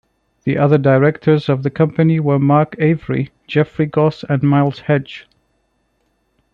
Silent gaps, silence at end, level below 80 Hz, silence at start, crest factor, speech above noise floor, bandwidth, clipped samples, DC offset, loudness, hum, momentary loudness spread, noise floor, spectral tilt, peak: none; 1.35 s; -52 dBFS; 0.45 s; 14 dB; 50 dB; 5.4 kHz; under 0.1%; under 0.1%; -16 LUFS; none; 8 LU; -64 dBFS; -10 dB/octave; -2 dBFS